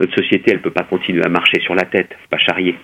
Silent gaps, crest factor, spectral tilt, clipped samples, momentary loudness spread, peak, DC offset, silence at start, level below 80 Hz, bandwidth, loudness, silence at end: none; 16 dB; -6 dB/octave; under 0.1%; 6 LU; 0 dBFS; under 0.1%; 0 s; -58 dBFS; 9.2 kHz; -15 LUFS; 0.05 s